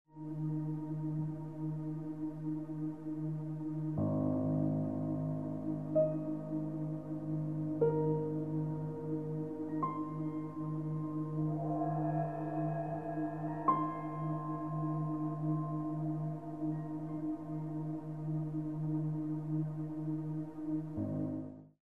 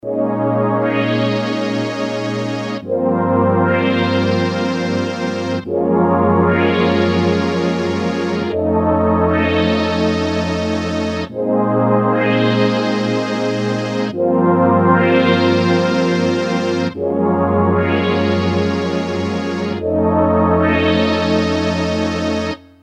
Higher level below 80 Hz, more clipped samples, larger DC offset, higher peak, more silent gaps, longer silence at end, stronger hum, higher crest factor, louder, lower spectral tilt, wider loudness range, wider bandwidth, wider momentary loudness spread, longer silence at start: second, -68 dBFS vs -42 dBFS; neither; first, 0.1% vs under 0.1%; second, -18 dBFS vs 0 dBFS; neither; second, 0.05 s vs 0.25 s; neither; about the same, 20 dB vs 16 dB; second, -38 LUFS vs -16 LUFS; first, -11.5 dB/octave vs -7 dB/octave; about the same, 3 LU vs 2 LU; second, 2.7 kHz vs 9.4 kHz; about the same, 7 LU vs 6 LU; about the same, 0.05 s vs 0.05 s